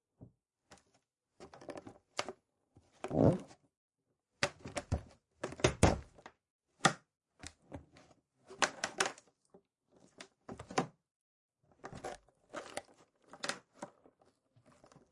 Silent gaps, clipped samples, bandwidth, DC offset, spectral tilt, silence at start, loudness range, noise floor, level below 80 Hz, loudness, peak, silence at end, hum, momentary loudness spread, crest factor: 3.77-3.89 s, 6.50-6.59 s, 11.11-11.49 s; under 0.1%; 11.5 kHz; under 0.1%; -4.5 dB/octave; 0.2 s; 12 LU; -84 dBFS; -56 dBFS; -37 LUFS; -12 dBFS; 1.25 s; none; 23 LU; 30 dB